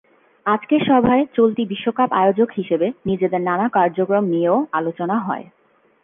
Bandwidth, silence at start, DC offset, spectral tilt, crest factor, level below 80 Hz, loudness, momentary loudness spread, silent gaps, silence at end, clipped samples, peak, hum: 3.8 kHz; 0.45 s; under 0.1%; -10 dB/octave; 14 dB; -56 dBFS; -19 LUFS; 7 LU; none; 0.6 s; under 0.1%; -4 dBFS; none